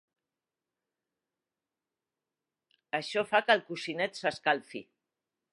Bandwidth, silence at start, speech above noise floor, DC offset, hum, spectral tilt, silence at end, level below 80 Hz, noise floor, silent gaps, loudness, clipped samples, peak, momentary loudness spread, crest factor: 11.5 kHz; 2.95 s; over 59 dB; under 0.1%; none; -3.5 dB/octave; 0.7 s; -84 dBFS; under -90 dBFS; none; -30 LUFS; under 0.1%; -8 dBFS; 11 LU; 26 dB